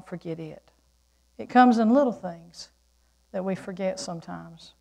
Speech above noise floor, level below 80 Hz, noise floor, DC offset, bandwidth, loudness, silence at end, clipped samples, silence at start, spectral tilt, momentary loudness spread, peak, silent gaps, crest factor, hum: 40 dB; -64 dBFS; -65 dBFS; under 0.1%; 10 kHz; -24 LUFS; 0.25 s; under 0.1%; 0.1 s; -6 dB/octave; 25 LU; -6 dBFS; none; 20 dB; none